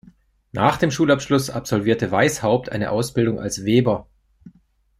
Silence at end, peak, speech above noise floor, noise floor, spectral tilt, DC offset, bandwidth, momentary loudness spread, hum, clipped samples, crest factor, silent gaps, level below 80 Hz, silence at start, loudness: 0.5 s; -2 dBFS; 39 dB; -58 dBFS; -5.5 dB/octave; under 0.1%; 15.5 kHz; 5 LU; none; under 0.1%; 18 dB; none; -50 dBFS; 0.55 s; -20 LUFS